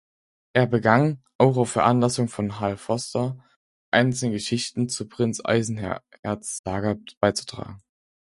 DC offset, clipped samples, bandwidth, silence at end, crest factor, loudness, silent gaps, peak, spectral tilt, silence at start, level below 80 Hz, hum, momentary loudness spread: under 0.1%; under 0.1%; 11.5 kHz; 0.5 s; 24 dB; -24 LUFS; 1.35-1.39 s, 3.56-3.92 s, 6.19-6.23 s, 6.59-6.64 s, 7.17-7.21 s; 0 dBFS; -5.5 dB/octave; 0.55 s; -54 dBFS; none; 11 LU